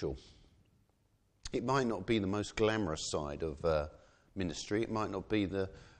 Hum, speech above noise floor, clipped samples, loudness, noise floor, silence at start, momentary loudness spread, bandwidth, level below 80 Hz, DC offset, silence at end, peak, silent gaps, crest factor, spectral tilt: none; 38 dB; under 0.1%; -35 LUFS; -73 dBFS; 0 s; 9 LU; 9.8 kHz; -54 dBFS; under 0.1%; 0.1 s; -18 dBFS; none; 18 dB; -5.5 dB/octave